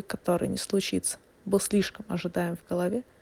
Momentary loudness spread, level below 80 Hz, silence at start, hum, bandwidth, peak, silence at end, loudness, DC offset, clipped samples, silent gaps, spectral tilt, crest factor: 6 LU; -58 dBFS; 0 s; none; 18 kHz; -12 dBFS; 0.2 s; -29 LUFS; under 0.1%; under 0.1%; none; -4.5 dB/octave; 18 dB